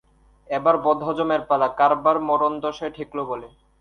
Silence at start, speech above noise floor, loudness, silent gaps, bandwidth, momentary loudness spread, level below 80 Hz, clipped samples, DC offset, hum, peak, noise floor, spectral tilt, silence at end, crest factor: 0.5 s; 20 dB; -22 LUFS; none; 6.6 kHz; 12 LU; -58 dBFS; under 0.1%; under 0.1%; none; -4 dBFS; -41 dBFS; -7 dB/octave; 0.35 s; 18 dB